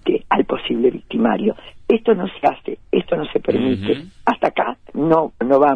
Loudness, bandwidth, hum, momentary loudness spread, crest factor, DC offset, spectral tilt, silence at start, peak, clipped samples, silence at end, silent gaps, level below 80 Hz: -19 LUFS; 6.4 kHz; none; 6 LU; 16 dB; under 0.1%; -8 dB/octave; 0.05 s; -2 dBFS; under 0.1%; 0 s; none; -48 dBFS